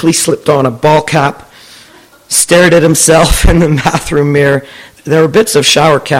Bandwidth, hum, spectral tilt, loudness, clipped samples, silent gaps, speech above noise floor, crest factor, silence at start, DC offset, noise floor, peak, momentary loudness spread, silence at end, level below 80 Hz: 17 kHz; none; -4 dB/octave; -8 LUFS; 0.6%; none; 31 dB; 8 dB; 0 s; under 0.1%; -39 dBFS; 0 dBFS; 6 LU; 0 s; -22 dBFS